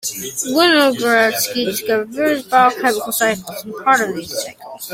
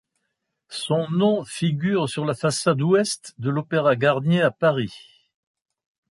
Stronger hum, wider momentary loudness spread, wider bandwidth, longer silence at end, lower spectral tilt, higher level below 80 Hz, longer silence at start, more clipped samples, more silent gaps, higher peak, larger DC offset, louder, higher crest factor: neither; first, 12 LU vs 8 LU; first, 16.5 kHz vs 11.5 kHz; second, 0 s vs 1.1 s; second, -2 dB/octave vs -5.5 dB/octave; about the same, -60 dBFS vs -64 dBFS; second, 0.05 s vs 0.7 s; neither; neither; first, -2 dBFS vs -6 dBFS; neither; first, -16 LUFS vs -22 LUFS; about the same, 16 dB vs 16 dB